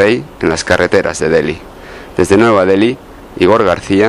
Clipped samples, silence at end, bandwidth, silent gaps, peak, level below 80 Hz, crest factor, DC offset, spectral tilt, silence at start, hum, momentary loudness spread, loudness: under 0.1%; 0 s; 13.5 kHz; none; 0 dBFS; -38 dBFS; 12 dB; under 0.1%; -5 dB/octave; 0 s; none; 18 LU; -12 LUFS